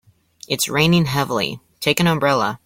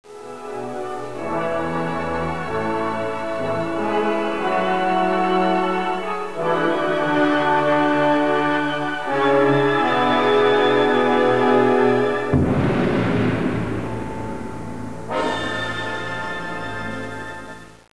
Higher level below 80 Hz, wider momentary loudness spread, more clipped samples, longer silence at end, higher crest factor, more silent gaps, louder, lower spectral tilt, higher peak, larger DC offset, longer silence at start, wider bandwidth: about the same, -50 dBFS vs -46 dBFS; second, 8 LU vs 13 LU; neither; about the same, 0.1 s vs 0.1 s; about the same, 18 dB vs 16 dB; neither; about the same, -18 LUFS vs -20 LUFS; second, -4.5 dB/octave vs -6.5 dB/octave; first, 0 dBFS vs -4 dBFS; second, under 0.1% vs 2%; first, 0.5 s vs 0.05 s; first, 16.5 kHz vs 11 kHz